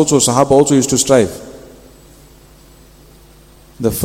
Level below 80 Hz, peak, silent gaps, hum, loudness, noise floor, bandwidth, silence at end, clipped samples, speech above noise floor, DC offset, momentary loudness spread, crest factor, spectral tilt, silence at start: -42 dBFS; 0 dBFS; none; none; -12 LUFS; -43 dBFS; 17 kHz; 0 s; 0.1%; 32 dB; under 0.1%; 15 LU; 16 dB; -4.5 dB/octave; 0 s